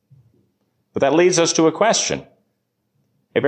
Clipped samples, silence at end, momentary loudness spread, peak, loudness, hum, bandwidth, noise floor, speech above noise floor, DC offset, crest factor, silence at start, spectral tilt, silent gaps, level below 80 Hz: under 0.1%; 0 s; 12 LU; -4 dBFS; -17 LUFS; none; 9.8 kHz; -71 dBFS; 55 dB; under 0.1%; 16 dB; 0.95 s; -3.5 dB/octave; none; -58 dBFS